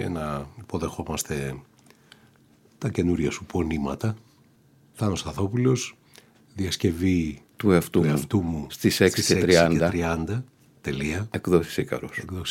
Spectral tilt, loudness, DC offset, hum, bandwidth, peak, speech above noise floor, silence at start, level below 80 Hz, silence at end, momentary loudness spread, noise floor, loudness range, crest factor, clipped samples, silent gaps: -5.5 dB/octave; -25 LUFS; under 0.1%; none; 17 kHz; -4 dBFS; 34 dB; 0 s; -46 dBFS; 0 s; 13 LU; -58 dBFS; 8 LU; 22 dB; under 0.1%; none